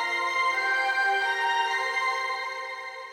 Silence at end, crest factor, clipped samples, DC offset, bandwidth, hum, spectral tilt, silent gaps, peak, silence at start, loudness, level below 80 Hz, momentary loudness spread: 0 s; 12 dB; under 0.1%; under 0.1%; 16 kHz; none; 1 dB/octave; none; -14 dBFS; 0 s; -26 LUFS; -78 dBFS; 9 LU